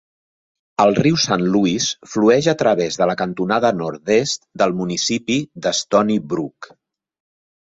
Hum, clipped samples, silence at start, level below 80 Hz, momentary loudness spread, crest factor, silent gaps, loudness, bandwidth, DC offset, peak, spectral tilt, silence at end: none; under 0.1%; 0.8 s; -56 dBFS; 7 LU; 18 dB; none; -18 LUFS; 8 kHz; under 0.1%; -2 dBFS; -4.5 dB/octave; 1.1 s